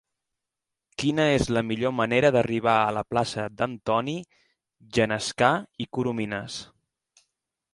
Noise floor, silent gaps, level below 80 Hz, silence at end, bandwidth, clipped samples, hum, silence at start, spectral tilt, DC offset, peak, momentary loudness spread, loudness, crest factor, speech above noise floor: -86 dBFS; none; -54 dBFS; 1.1 s; 11.5 kHz; under 0.1%; none; 1 s; -5 dB/octave; under 0.1%; -4 dBFS; 11 LU; -25 LUFS; 22 dB; 62 dB